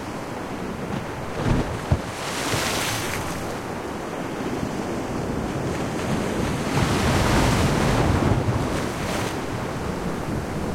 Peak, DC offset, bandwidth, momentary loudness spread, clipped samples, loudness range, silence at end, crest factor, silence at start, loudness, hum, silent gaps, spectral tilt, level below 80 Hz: -8 dBFS; under 0.1%; 16.5 kHz; 9 LU; under 0.1%; 5 LU; 0 s; 16 dB; 0 s; -25 LUFS; none; none; -5 dB/octave; -36 dBFS